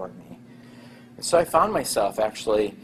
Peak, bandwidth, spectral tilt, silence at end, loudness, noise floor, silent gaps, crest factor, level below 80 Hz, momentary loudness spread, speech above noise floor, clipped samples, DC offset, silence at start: -4 dBFS; 15 kHz; -3.5 dB/octave; 0 s; -23 LUFS; -46 dBFS; none; 20 dB; -54 dBFS; 14 LU; 24 dB; under 0.1%; under 0.1%; 0 s